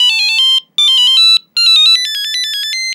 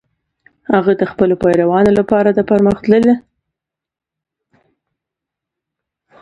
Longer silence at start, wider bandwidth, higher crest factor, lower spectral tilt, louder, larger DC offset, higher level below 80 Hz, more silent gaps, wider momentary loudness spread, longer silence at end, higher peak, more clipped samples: second, 0 s vs 0.7 s; first, 18.5 kHz vs 10.5 kHz; second, 10 dB vs 16 dB; second, 6 dB/octave vs -8.5 dB/octave; first, -8 LUFS vs -13 LUFS; neither; second, under -90 dBFS vs -46 dBFS; neither; first, 9 LU vs 4 LU; second, 0 s vs 3 s; about the same, 0 dBFS vs 0 dBFS; neither